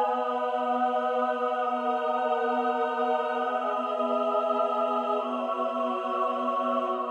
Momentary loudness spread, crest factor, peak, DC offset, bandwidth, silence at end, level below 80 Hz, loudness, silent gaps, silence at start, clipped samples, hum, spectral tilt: 2 LU; 12 dB; -14 dBFS; under 0.1%; 9.4 kHz; 0 s; -80 dBFS; -27 LUFS; none; 0 s; under 0.1%; none; -4.5 dB/octave